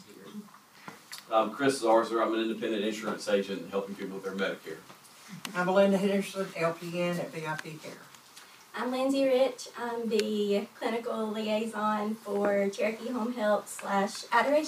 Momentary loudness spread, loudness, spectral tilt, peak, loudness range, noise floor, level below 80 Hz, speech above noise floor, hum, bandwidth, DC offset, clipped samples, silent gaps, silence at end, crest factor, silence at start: 20 LU; -30 LUFS; -5 dB/octave; -10 dBFS; 3 LU; -53 dBFS; -84 dBFS; 24 dB; none; 15.5 kHz; under 0.1%; under 0.1%; none; 0 s; 20 dB; 0 s